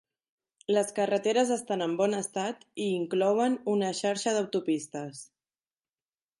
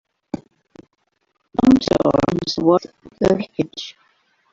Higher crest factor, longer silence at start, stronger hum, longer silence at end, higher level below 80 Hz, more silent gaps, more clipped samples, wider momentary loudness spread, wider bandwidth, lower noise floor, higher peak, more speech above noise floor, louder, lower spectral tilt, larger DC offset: about the same, 18 dB vs 18 dB; first, 0.7 s vs 0.35 s; neither; first, 1.15 s vs 0.6 s; second, -82 dBFS vs -46 dBFS; neither; neither; second, 10 LU vs 18 LU; first, 11.5 kHz vs 7.6 kHz; first, under -90 dBFS vs -69 dBFS; second, -12 dBFS vs -2 dBFS; first, over 62 dB vs 49 dB; second, -29 LUFS vs -18 LUFS; second, -4.5 dB/octave vs -6.5 dB/octave; neither